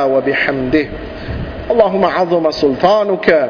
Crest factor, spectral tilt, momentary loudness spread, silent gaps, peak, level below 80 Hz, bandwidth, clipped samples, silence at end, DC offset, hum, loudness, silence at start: 14 dB; -7 dB/octave; 12 LU; none; 0 dBFS; -34 dBFS; 5.4 kHz; under 0.1%; 0 s; under 0.1%; none; -14 LUFS; 0 s